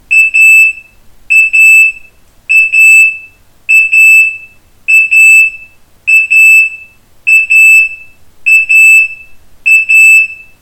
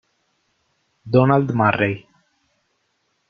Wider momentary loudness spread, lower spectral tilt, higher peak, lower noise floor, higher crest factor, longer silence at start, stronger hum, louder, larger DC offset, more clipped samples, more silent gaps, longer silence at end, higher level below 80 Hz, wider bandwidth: first, 12 LU vs 7 LU; second, 3 dB/octave vs -9.5 dB/octave; about the same, 0 dBFS vs 0 dBFS; second, -38 dBFS vs -69 dBFS; second, 6 dB vs 22 dB; second, 0.1 s vs 1.05 s; neither; first, -3 LUFS vs -18 LUFS; first, 0.2% vs under 0.1%; first, 3% vs under 0.1%; neither; second, 0.25 s vs 1.3 s; first, -48 dBFS vs -58 dBFS; first, 19.5 kHz vs 6.4 kHz